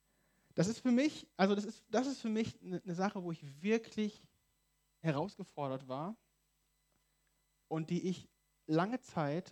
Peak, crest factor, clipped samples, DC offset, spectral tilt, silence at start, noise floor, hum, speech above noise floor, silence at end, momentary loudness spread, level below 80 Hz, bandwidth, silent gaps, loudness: -16 dBFS; 22 dB; under 0.1%; under 0.1%; -6 dB/octave; 0.55 s; -79 dBFS; none; 42 dB; 0 s; 10 LU; -78 dBFS; 11.5 kHz; none; -38 LUFS